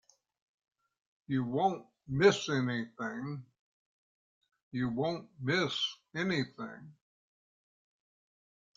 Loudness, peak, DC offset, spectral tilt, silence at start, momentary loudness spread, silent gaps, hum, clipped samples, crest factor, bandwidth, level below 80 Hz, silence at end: -33 LUFS; -12 dBFS; under 0.1%; -5.5 dB/octave; 1.3 s; 16 LU; 3.59-4.41 s, 4.63-4.71 s; none; under 0.1%; 24 dB; 7.6 kHz; -70 dBFS; 1.85 s